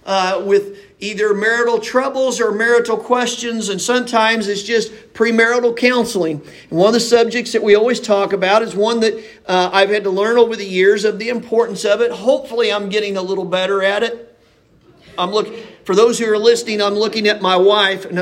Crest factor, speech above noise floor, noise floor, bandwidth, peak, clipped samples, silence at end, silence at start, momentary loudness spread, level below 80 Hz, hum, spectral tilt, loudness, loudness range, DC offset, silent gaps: 16 dB; 37 dB; -52 dBFS; 15.5 kHz; 0 dBFS; under 0.1%; 0 s; 0.05 s; 7 LU; -60 dBFS; none; -3.5 dB/octave; -15 LUFS; 3 LU; under 0.1%; none